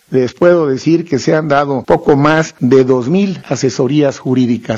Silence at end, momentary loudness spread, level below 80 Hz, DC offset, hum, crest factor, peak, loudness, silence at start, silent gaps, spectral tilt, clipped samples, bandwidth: 0 s; 5 LU; -46 dBFS; under 0.1%; none; 12 dB; 0 dBFS; -12 LUFS; 0.1 s; none; -6.5 dB/octave; under 0.1%; 8 kHz